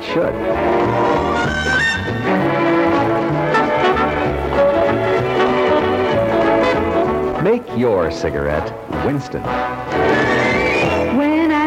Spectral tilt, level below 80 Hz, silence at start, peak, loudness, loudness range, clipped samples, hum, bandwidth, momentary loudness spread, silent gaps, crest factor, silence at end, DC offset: -6 dB/octave; -36 dBFS; 0 s; -2 dBFS; -16 LUFS; 2 LU; under 0.1%; none; 15.5 kHz; 6 LU; none; 14 dB; 0 s; under 0.1%